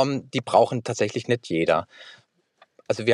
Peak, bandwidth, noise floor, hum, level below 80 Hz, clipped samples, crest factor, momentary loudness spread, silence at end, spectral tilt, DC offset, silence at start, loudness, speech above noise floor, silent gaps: -4 dBFS; 11.5 kHz; -61 dBFS; none; -68 dBFS; under 0.1%; 20 dB; 8 LU; 0 s; -5.5 dB/octave; under 0.1%; 0 s; -24 LUFS; 38 dB; none